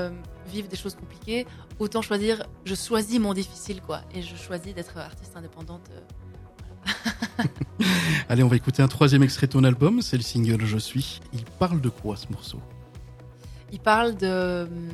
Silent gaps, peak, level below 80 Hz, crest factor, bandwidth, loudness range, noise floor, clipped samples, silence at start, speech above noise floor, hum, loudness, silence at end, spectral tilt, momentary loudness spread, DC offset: none; -2 dBFS; -48 dBFS; 22 dB; 14 kHz; 13 LU; -44 dBFS; under 0.1%; 0 s; 19 dB; none; -25 LUFS; 0 s; -6 dB/octave; 23 LU; under 0.1%